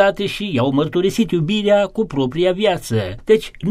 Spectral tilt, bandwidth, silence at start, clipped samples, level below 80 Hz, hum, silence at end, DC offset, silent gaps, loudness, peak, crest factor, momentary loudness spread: -6 dB/octave; 15 kHz; 0 s; under 0.1%; -44 dBFS; none; 0 s; under 0.1%; none; -18 LUFS; -2 dBFS; 16 dB; 5 LU